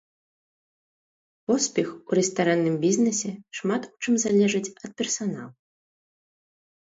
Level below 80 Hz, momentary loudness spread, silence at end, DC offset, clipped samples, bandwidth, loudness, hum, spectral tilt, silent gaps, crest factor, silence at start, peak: -70 dBFS; 11 LU; 1.4 s; under 0.1%; under 0.1%; 8 kHz; -25 LUFS; none; -4.5 dB/octave; none; 18 dB; 1.5 s; -10 dBFS